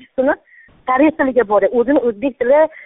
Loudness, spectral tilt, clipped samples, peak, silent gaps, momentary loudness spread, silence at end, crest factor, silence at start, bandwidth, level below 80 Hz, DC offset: -15 LUFS; -4.5 dB/octave; under 0.1%; -2 dBFS; none; 6 LU; 0.05 s; 14 dB; 0.2 s; 3.9 kHz; -50 dBFS; under 0.1%